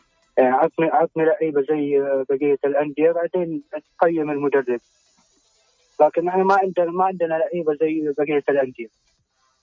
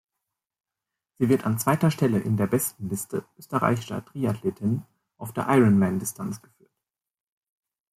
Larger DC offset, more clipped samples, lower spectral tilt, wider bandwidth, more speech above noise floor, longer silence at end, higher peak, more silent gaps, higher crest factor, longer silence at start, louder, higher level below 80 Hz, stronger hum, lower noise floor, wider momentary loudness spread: neither; neither; first, -8 dB/octave vs -6.5 dB/octave; second, 7.2 kHz vs 16 kHz; second, 46 dB vs 63 dB; second, 0.75 s vs 1.6 s; about the same, -4 dBFS vs -6 dBFS; neither; about the same, 16 dB vs 20 dB; second, 0.35 s vs 1.2 s; first, -20 LUFS vs -25 LUFS; second, -68 dBFS vs -62 dBFS; neither; second, -66 dBFS vs -87 dBFS; second, 8 LU vs 14 LU